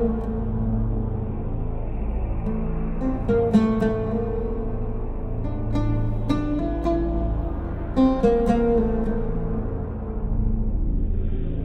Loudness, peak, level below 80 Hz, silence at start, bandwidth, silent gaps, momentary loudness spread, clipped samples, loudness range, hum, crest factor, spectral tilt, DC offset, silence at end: -25 LUFS; -6 dBFS; -26 dBFS; 0 s; 6.4 kHz; none; 10 LU; under 0.1%; 3 LU; none; 16 dB; -9.5 dB/octave; under 0.1%; 0 s